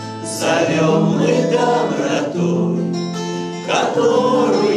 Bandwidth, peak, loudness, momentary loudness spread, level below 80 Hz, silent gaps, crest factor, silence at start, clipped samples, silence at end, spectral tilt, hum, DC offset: 13.5 kHz; -2 dBFS; -17 LUFS; 8 LU; -64 dBFS; none; 14 dB; 0 s; under 0.1%; 0 s; -5.5 dB/octave; none; under 0.1%